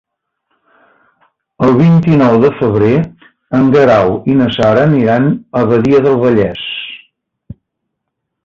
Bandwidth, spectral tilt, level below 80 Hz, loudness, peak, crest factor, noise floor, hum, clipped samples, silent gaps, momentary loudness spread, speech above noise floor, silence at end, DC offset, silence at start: 7.2 kHz; -8.5 dB/octave; -44 dBFS; -10 LUFS; 0 dBFS; 12 dB; -74 dBFS; none; under 0.1%; none; 9 LU; 64 dB; 1.5 s; under 0.1%; 1.6 s